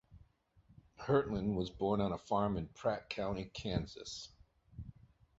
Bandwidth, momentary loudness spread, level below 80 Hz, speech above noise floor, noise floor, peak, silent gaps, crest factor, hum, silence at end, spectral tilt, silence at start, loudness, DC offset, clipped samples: 8 kHz; 19 LU; -56 dBFS; 32 dB; -68 dBFS; -18 dBFS; none; 22 dB; none; 0.5 s; -6 dB/octave; 0.1 s; -38 LUFS; under 0.1%; under 0.1%